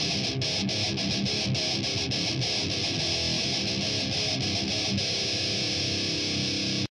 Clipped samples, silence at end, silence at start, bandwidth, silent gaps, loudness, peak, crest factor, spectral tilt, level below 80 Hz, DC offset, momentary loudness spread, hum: under 0.1%; 0.1 s; 0 s; 12 kHz; none; -26 LUFS; -16 dBFS; 12 dB; -3 dB/octave; -52 dBFS; under 0.1%; 1 LU; none